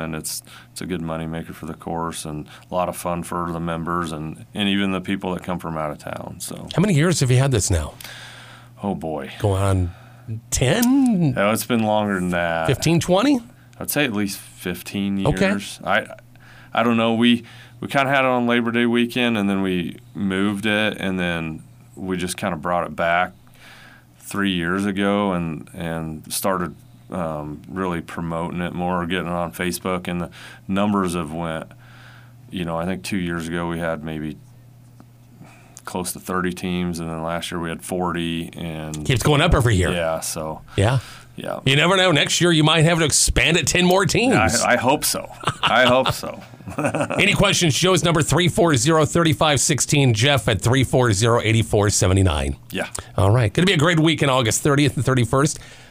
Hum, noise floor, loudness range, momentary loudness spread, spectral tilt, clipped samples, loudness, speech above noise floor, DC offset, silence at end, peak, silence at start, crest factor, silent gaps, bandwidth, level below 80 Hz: none; -46 dBFS; 10 LU; 14 LU; -4.5 dB/octave; under 0.1%; -20 LUFS; 26 dB; under 0.1%; 0.05 s; -2 dBFS; 0 s; 20 dB; none; 16 kHz; -42 dBFS